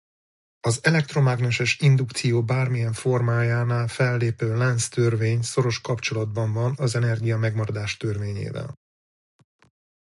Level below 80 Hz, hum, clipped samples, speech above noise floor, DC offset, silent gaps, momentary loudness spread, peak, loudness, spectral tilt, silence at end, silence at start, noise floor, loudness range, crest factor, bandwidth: -54 dBFS; none; under 0.1%; over 68 dB; under 0.1%; none; 7 LU; -6 dBFS; -23 LUFS; -5.5 dB/octave; 1.45 s; 0.65 s; under -90 dBFS; 5 LU; 16 dB; 11.5 kHz